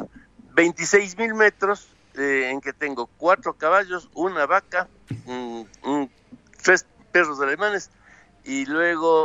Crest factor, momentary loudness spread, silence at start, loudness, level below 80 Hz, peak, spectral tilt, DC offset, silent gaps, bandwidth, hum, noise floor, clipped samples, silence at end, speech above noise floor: 20 dB; 14 LU; 0 s; -22 LUFS; -62 dBFS; -4 dBFS; -3.5 dB/octave; under 0.1%; none; 8 kHz; none; -50 dBFS; under 0.1%; 0 s; 28 dB